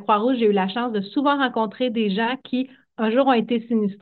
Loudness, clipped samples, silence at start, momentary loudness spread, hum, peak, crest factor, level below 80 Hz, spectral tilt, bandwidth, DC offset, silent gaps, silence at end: -22 LUFS; under 0.1%; 0 s; 8 LU; none; -6 dBFS; 16 dB; -72 dBFS; -9 dB/octave; 4.6 kHz; under 0.1%; none; 0.05 s